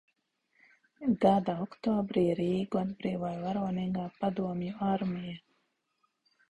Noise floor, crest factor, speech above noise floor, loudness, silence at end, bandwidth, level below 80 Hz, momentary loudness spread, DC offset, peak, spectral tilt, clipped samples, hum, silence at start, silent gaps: -77 dBFS; 22 dB; 47 dB; -32 LUFS; 1.1 s; 8.2 kHz; -64 dBFS; 9 LU; under 0.1%; -10 dBFS; -8.5 dB/octave; under 0.1%; none; 1 s; none